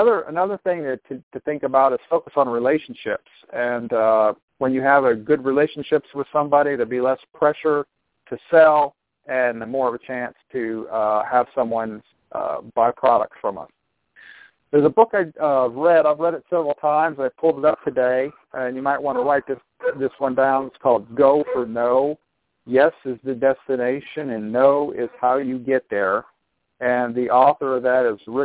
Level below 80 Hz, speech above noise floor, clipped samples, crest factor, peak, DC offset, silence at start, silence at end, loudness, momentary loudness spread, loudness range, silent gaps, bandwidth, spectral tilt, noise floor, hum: -64 dBFS; 37 dB; under 0.1%; 18 dB; -2 dBFS; under 0.1%; 0 s; 0 s; -20 LUFS; 12 LU; 3 LU; 1.23-1.31 s, 4.43-4.48 s; 4 kHz; -10 dB/octave; -57 dBFS; none